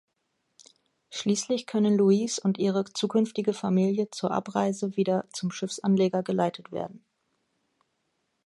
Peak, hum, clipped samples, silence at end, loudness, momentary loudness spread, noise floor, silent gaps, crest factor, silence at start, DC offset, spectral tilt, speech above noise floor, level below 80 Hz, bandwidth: -10 dBFS; none; under 0.1%; 1.5 s; -27 LUFS; 9 LU; -77 dBFS; none; 18 dB; 1.1 s; under 0.1%; -6 dB/octave; 51 dB; -74 dBFS; 11.5 kHz